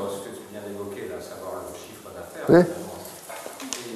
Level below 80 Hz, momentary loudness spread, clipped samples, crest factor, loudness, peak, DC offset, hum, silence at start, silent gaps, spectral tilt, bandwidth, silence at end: -62 dBFS; 20 LU; under 0.1%; 24 dB; -26 LUFS; -4 dBFS; under 0.1%; none; 0 s; none; -5.5 dB/octave; 13.5 kHz; 0 s